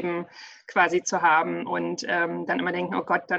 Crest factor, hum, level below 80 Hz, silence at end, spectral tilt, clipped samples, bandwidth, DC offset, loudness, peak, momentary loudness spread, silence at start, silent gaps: 16 dB; none; -70 dBFS; 0 s; -4 dB/octave; under 0.1%; 8.2 kHz; under 0.1%; -25 LUFS; -8 dBFS; 10 LU; 0 s; none